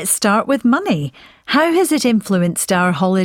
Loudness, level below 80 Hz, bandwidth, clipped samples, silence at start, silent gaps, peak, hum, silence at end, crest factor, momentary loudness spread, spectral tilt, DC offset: -16 LUFS; -56 dBFS; 17 kHz; under 0.1%; 0 s; none; -2 dBFS; none; 0 s; 14 dB; 6 LU; -4.5 dB/octave; under 0.1%